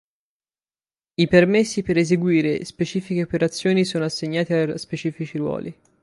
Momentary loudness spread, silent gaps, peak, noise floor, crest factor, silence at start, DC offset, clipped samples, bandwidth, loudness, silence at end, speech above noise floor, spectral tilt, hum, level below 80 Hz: 11 LU; none; -2 dBFS; under -90 dBFS; 20 dB; 1.2 s; under 0.1%; under 0.1%; 11.5 kHz; -21 LUFS; 0.3 s; over 69 dB; -6 dB/octave; none; -54 dBFS